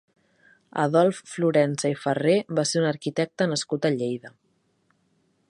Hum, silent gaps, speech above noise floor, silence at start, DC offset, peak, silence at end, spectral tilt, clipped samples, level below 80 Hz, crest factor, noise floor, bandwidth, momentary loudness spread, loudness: none; none; 44 dB; 0.75 s; under 0.1%; -6 dBFS; 1.2 s; -5 dB/octave; under 0.1%; -72 dBFS; 20 dB; -68 dBFS; 11.5 kHz; 7 LU; -24 LUFS